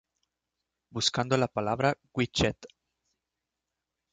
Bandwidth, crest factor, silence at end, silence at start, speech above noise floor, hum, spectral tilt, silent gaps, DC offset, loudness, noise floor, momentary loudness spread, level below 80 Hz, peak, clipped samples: 9.4 kHz; 22 dB; 1.45 s; 0.95 s; 58 dB; none; -4.5 dB/octave; none; under 0.1%; -28 LUFS; -87 dBFS; 5 LU; -54 dBFS; -10 dBFS; under 0.1%